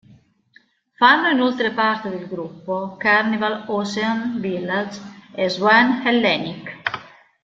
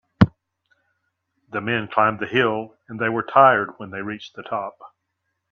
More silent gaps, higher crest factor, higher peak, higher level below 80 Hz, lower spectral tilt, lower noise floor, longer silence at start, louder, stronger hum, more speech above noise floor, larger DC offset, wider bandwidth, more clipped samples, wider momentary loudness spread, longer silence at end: neither; about the same, 20 dB vs 22 dB; about the same, -2 dBFS vs 0 dBFS; second, -64 dBFS vs -50 dBFS; second, -5 dB/octave vs -8 dB/octave; second, -56 dBFS vs -77 dBFS; first, 1 s vs 0.2 s; about the same, -19 LUFS vs -21 LUFS; neither; second, 37 dB vs 55 dB; neither; first, 7.8 kHz vs 7 kHz; neither; about the same, 16 LU vs 17 LU; second, 0.35 s vs 0.65 s